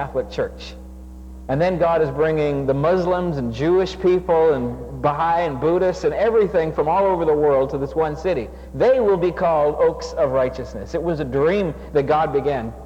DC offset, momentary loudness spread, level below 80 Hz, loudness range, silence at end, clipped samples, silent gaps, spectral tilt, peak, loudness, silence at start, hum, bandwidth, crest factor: under 0.1%; 9 LU; -38 dBFS; 2 LU; 0 s; under 0.1%; none; -7.5 dB/octave; -6 dBFS; -20 LUFS; 0 s; none; 8.8 kHz; 14 dB